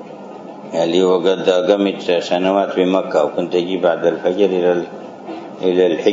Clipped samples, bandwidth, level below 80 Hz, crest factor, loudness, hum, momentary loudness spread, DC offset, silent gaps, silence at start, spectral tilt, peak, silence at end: under 0.1%; 7.8 kHz; -68 dBFS; 16 dB; -16 LUFS; none; 16 LU; under 0.1%; none; 0 s; -6 dB/octave; 0 dBFS; 0 s